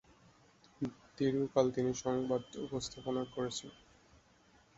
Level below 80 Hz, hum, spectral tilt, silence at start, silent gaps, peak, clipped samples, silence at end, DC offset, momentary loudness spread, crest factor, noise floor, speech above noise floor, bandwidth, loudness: -66 dBFS; none; -6 dB/octave; 0.8 s; none; -16 dBFS; under 0.1%; 1.05 s; under 0.1%; 11 LU; 22 dB; -67 dBFS; 31 dB; 8 kHz; -37 LUFS